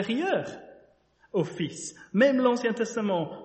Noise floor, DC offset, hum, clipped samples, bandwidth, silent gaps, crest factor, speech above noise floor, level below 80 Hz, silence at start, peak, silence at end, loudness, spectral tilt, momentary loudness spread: -62 dBFS; under 0.1%; none; under 0.1%; 8.4 kHz; none; 18 dB; 36 dB; -70 dBFS; 0 s; -10 dBFS; 0 s; -27 LUFS; -5 dB/octave; 14 LU